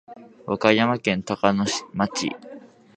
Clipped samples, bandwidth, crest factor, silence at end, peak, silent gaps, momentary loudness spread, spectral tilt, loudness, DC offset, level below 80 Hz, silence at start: under 0.1%; 9.4 kHz; 24 dB; 0.3 s; 0 dBFS; none; 17 LU; -4.5 dB/octave; -22 LUFS; under 0.1%; -58 dBFS; 0.1 s